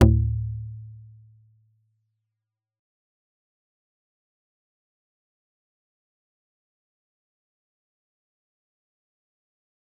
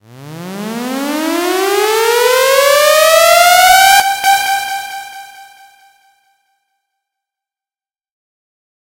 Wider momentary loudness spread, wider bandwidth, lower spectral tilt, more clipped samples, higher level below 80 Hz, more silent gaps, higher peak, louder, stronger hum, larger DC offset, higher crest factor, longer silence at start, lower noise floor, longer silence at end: first, 24 LU vs 18 LU; second, 0.8 kHz vs over 20 kHz; first, -9 dB/octave vs -1 dB/octave; second, under 0.1% vs 0.2%; first, -38 dBFS vs -50 dBFS; neither; about the same, -2 dBFS vs 0 dBFS; second, -26 LUFS vs -9 LUFS; neither; neither; first, 30 dB vs 14 dB; second, 0 s vs 0.15 s; second, -86 dBFS vs under -90 dBFS; first, 9 s vs 3.45 s